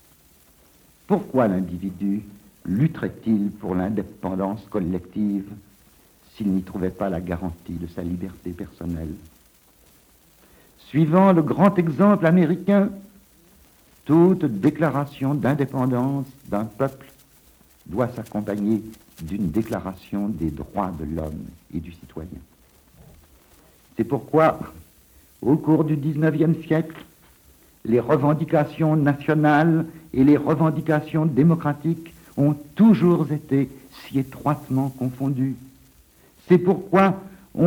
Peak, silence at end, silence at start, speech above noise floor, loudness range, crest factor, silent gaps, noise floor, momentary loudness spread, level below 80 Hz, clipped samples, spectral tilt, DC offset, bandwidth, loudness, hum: -2 dBFS; 0 s; 1.1 s; 34 dB; 10 LU; 20 dB; none; -55 dBFS; 16 LU; -52 dBFS; under 0.1%; -9 dB/octave; under 0.1%; 18.5 kHz; -22 LUFS; none